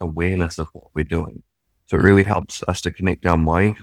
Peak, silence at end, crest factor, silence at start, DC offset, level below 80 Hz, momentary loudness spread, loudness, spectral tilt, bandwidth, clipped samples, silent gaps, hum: 0 dBFS; 0 s; 20 dB; 0 s; under 0.1%; -34 dBFS; 13 LU; -20 LUFS; -6.5 dB/octave; 12.5 kHz; under 0.1%; none; none